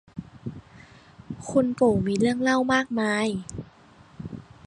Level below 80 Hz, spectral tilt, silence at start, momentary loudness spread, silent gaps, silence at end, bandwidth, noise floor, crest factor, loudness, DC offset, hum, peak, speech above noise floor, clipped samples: -54 dBFS; -5.5 dB/octave; 0.15 s; 19 LU; none; 0.25 s; 11 kHz; -53 dBFS; 18 dB; -24 LUFS; under 0.1%; none; -8 dBFS; 30 dB; under 0.1%